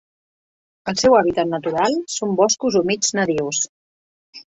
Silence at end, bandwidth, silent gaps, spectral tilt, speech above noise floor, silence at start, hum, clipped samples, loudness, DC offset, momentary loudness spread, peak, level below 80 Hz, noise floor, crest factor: 0.1 s; 8.2 kHz; 3.69-4.33 s; -3.5 dB/octave; over 72 dB; 0.85 s; none; under 0.1%; -19 LUFS; under 0.1%; 8 LU; -2 dBFS; -56 dBFS; under -90 dBFS; 18 dB